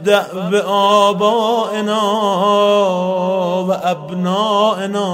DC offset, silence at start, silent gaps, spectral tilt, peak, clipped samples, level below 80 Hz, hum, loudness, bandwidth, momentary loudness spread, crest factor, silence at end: under 0.1%; 0 s; none; -5 dB/octave; -2 dBFS; under 0.1%; -66 dBFS; none; -15 LUFS; 16 kHz; 6 LU; 14 dB; 0 s